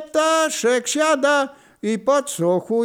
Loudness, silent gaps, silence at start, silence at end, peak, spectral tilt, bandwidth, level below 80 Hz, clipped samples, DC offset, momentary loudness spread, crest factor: -19 LUFS; none; 0 s; 0 s; -6 dBFS; -3 dB/octave; 19 kHz; -70 dBFS; under 0.1%; under 0.1%; 7 LU; 14 dB